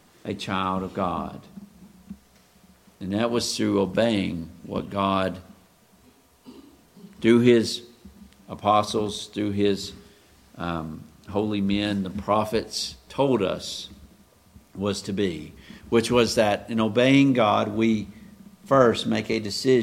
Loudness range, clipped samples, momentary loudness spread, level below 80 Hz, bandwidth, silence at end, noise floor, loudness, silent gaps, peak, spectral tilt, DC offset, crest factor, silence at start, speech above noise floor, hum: 7 LU; under 0.1%; 16 LU; -54 dBFS; 16 kHz; 0 s; -57 dBFS; -24 LUFS; none; -4 dBFS; -5.5 dB/octave; under 0.1%; 22 dB; 0.25 s; 34 dB; none